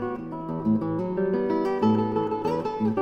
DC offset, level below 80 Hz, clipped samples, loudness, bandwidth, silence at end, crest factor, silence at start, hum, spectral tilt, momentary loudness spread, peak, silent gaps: under 0.1%; -56 dBFS; under 0.1%; -26 LUFS; 6.8 kHz; 0 s; 14 dB; 0 s; none; -9 dB/octave; 7 LU; -10 dBFS; none